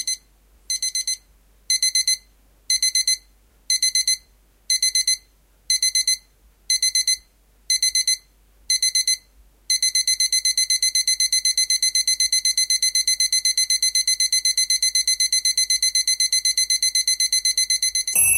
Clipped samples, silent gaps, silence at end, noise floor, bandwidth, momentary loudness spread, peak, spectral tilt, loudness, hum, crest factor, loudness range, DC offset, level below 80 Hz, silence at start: under 0.1%; none; 0 s; -56 dBFS; 17 kHz; 6 LU; -4 dBFS; 5 dB/octave; -18 LUFS; none; 18 dB; 3 LU; under 0.1%; -56 dBFS; 0 s